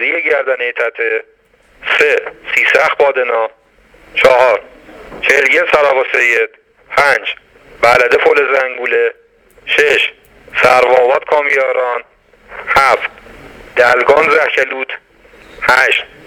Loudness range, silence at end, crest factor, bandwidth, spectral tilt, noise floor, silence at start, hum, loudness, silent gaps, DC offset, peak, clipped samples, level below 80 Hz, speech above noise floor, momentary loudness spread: 2 LU; 0.2 s; 14 dB; 19 kHz; -2.5 dB/octave; -45 dBFS; 0 s; none; -11 LUFS; none; under 0.1%; 0 dBFS; 0.2%; -48 dBFS; 34 dB; 12 LU